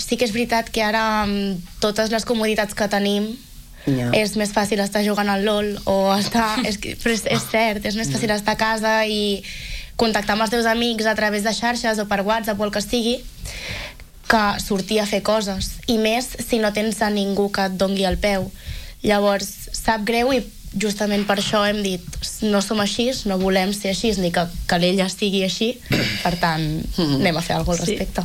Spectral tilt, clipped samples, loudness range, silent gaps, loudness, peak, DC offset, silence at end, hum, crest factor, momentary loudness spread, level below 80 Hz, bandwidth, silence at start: -4 dB/octave; under 0.1%; 2 LU; none; -20 LUFS; -2 dBFS; under 0.1%; 0 s; none; 20 dB; 6 LU; -38 dBFS; 17 kHz; 0 s